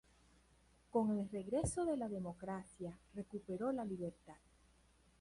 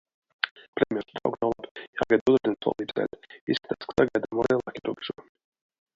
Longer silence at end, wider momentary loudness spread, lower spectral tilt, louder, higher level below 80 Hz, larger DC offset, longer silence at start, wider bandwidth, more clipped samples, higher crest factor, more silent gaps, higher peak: about the same, 0.85 s vs 0.75 s; about the same, 13 LU vs 12 LU; about the same, -6.5 dB/octave vs -6.5 dB/octave; second, -42 LUFS vs -28 LUFS; about the same, -62 dBFS vs -60 dBFS; neither; first, 0.95 s vs 0.45 s; first, 11.5 kHz vs 7.6 kHz; neither; second, 18 dB vs 26 dB; second, none vs 0.51-0.56 s, 0.68-0.73 s, 1.71-1.75 s, 1.88-1.93 s, 2.21-2.26 s, 3.41-3.47 s; second, -26 dBFS vs -2 dBFS